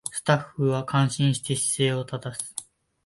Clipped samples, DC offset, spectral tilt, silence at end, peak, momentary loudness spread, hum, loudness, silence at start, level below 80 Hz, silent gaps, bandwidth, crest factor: under 0.1%; under 0.1%; -4.5 dB/octave; 0.45 s; -8 dBFS; 10 LU; none; -25 LUFS; 0.05 s; -62 dBFS; none; 11.5 kHz; 18 dB